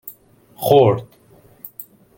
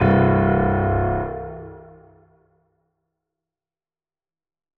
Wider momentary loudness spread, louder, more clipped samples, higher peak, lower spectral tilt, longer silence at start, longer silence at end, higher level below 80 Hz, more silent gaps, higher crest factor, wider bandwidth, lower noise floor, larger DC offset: first, 24 LU vs 20 LU; first, -16 LUFS vs -19 LUFS; neither; about the same, -2 dBFS vs -4 dBFS; second, -6.5 dB/octave vs -11.5 dB/octave; about the same, 0.05 s vs 0 s; second, 0.35 s vs 2.95 s; second, -58 dBFS vs -38 dBFS; neither; about the same, 18 dB vs 20 dB; first, 17 kHz vs 4.2 kHz; second, -48 dBFS vs under -90 dBFS; neither